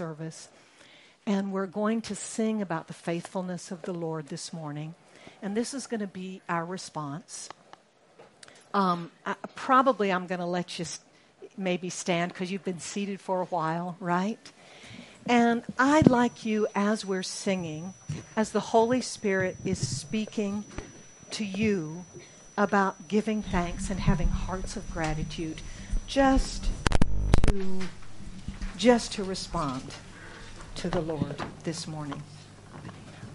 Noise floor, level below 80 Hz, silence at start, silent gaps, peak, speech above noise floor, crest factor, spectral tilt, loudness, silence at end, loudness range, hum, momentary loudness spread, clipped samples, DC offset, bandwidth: -57 dBFS; -38 dBFS; 0 s; none; 0 dBFS; 28 dB; 28 dB; -5 dB/octave; -29 LUFS; 0 s; 9 LU; none; 19 LU; under 0.1%; under 0.1%; 11.5 kHz